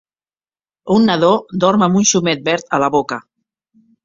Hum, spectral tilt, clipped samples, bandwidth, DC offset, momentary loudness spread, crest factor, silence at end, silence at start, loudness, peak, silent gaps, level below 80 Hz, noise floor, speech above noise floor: none; -4 dB/octave; under 0.1%; 7.6 kHz; under 0.1%; 9 LU; 16 dB; 0.85 s; 0.85 s; -15 LUFS; -2 dBFS; none; -56 dBFS; under -90 dBFS; over 76 dB